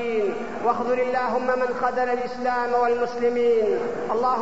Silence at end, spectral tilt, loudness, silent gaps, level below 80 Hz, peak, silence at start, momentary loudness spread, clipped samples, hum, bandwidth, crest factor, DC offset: 0 s; -5.5 dB/octave; -23 LUFS; none; -56 dBFS; -8 dBFS; 0 s; 5 LU; under 0.1%; none; 8 kHz; 14 dB; 1%